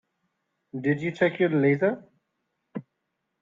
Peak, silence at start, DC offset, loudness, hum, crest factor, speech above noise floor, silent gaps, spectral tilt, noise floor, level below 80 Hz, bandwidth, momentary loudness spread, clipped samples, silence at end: -8 dBFS; 0.75 s; under 0.1%; -25 LUFS; none; 20 dB; 56 dB; none; -8.5 dB/octave; -80 dBFS; -72 dBFS; 7.4 kHz; 19 LU; under 0.1%; 0.6 s